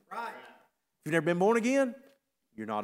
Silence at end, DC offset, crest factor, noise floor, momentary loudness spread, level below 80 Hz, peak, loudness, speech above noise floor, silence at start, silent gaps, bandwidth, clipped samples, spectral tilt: 0 s; under 0.1%; 18 dB; -67 dBFS; 18 LU; -84 dBFS; -14 dBFS; -29 LUFS; 39 dB; 0.1 s; none; 16 kHz; under 0.1%; -6 dB/octave